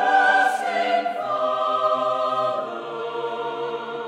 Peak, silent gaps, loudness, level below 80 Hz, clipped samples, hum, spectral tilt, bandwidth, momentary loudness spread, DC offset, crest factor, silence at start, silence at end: -6 dBFS; none; -22 LUFS; -80 dBFS; under 0.1%; none; -3 dB/octave; 13.5 kHz; 11 LU; under 0.1%; 16 dB; 0 s; 0 s